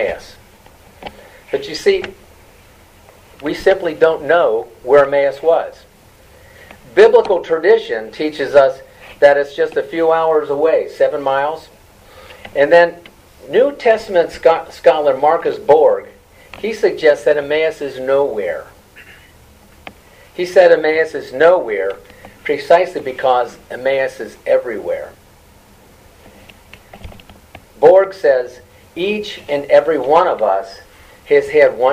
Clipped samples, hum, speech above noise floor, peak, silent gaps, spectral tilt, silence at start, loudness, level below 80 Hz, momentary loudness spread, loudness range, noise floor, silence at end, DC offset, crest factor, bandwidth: under 0.1%; none; 32 dB; 0 dBFS; none; -5 dB/octave; 0 s; -14 LUFS; -50 dBFS; 14 LU; 6 LU; -46 dBFS; 0 s; under 0.1%; 16 dB; 15 kHz